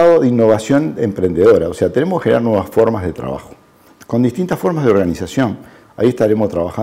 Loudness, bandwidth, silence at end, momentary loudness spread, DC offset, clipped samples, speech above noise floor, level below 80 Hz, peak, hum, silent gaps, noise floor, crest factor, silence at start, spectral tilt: -15 LUFS; 16 kHz; 0 s; 10 LU; under 0.1%; under 0.1%; 31 dB; -48 dBFS; -2 dBFS; none; none; -45 dBFS; 12 dB; 0 s; -7.5 dB/octave